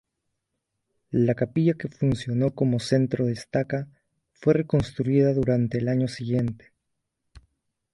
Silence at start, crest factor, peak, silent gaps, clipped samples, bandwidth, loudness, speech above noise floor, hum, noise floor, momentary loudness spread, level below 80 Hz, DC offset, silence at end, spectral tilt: 1.1 s; 18 dB; -6 dBFS; none; under 0.1%; 11.5 kHz; -25 LUFS; 57 dB; none; -80 dBFS; 7 LU; -52 dBFS; under 0.1%; 1.35 s; -8 dB/octave